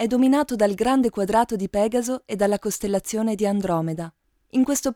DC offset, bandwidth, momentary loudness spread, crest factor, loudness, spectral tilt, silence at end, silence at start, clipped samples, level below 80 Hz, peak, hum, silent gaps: under 0.1%; 17.5 kHz; 7 LU; 16 dB; -22 LUFS; -5 dB/octave; 0 s; 0 s; under 0.1%; -52 dBFS; -6 dBFS; none; none